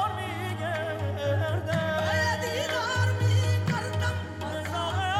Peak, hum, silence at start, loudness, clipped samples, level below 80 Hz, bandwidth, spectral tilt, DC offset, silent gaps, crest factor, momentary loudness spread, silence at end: -14 dBFS; none; 0 s; -28 LUFS; under 0.1%; -58 dBFS; 15 kHz; -5 dB/octave; under 0.1%; none; 14 dB; 7 LU; 0 s